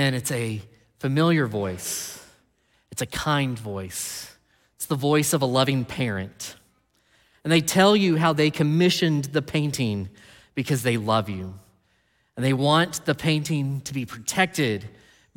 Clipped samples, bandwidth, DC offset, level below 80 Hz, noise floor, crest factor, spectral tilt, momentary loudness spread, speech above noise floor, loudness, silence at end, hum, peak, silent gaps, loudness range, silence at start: under 0.1%; 17.5 kHz; under 0.1%; -58 dBFS; -67 dBFS; 20 dB; -5 dB/octave; 15 LU; 43 dB; -23 LUFS; 0.5 s; none; -6 dBFS; none; 6 LU; 0 s